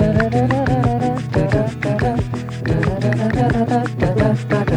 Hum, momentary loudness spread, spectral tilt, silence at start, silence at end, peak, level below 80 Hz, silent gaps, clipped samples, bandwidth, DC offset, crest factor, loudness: none; 4 LU; -8 dB/octave; 0 s; 0 s; -2 dBFS; -32 dBFS; none; under 0.1%; 10.5 kHz; under 0.1%; 14 dB; -18 LUFS